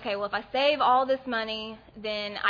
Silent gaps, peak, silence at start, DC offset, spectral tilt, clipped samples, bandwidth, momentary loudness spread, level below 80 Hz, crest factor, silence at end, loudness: none; -8 dBFS; 0 s; under 0.1%; -4.5 dB/octave; under 0.1%; 5.2 kHz; 12 LU; -62 dBFS; 18 dB; 0 s; -27 LUFS